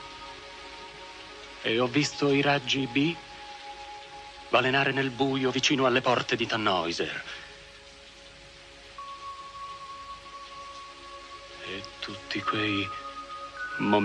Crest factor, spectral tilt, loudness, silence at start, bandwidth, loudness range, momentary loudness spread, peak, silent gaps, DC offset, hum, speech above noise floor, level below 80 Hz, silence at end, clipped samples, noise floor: 22 dB; -4.5 dB/octave; -27 LUFS; 0 s; 10 kHz; 16 LU; 19 LU; -8 dBFS; none; under 0.1%; none; 23 dB; -60 dBFS; 0 s; under 0.1%; -49 dBFS